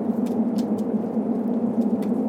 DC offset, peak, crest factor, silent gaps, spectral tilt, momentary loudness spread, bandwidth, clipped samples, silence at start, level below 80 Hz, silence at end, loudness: under 0.1%; -12 dBFS; 12 dB; none; -9 dB/octave; 2 LU; 11 kHz; under 0.1%; 0 s; -70 dBFS; 0 s; -24 LUFS